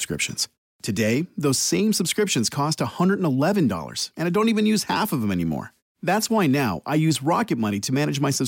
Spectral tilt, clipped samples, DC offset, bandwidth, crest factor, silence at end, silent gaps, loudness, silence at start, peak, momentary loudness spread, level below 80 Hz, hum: -4.5 dB/octave; under 0.1%; under 0.1%; 17 kHz; 12 dB; 0 s; 0.58-0.79 s, 5.82-5.95 s; -22 LUFS; 0 s; -10 dBFS; 7 LU; -58 dBFS; none